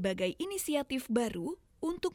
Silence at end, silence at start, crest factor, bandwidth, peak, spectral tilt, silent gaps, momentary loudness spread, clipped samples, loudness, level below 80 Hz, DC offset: 0 s; 0 s; 18 dB; 19 kHz; -16 dBFS; -4.5 dB/octave; none; 7 LU; under 0.1%; -35 LUFS; -60 dBFS; under 0.1%